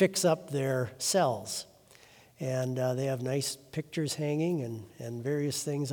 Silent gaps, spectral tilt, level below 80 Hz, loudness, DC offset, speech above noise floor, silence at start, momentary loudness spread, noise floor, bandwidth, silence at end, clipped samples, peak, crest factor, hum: none; -4.5 dB/octave; -74 dBFS; -32 LUFS; under 0.1%; 27 dB; 0 s; 11 LU; -57 dBFS; over 20 kHz; 0 s; under 0.1%; -12 dBFS; 20 dB; none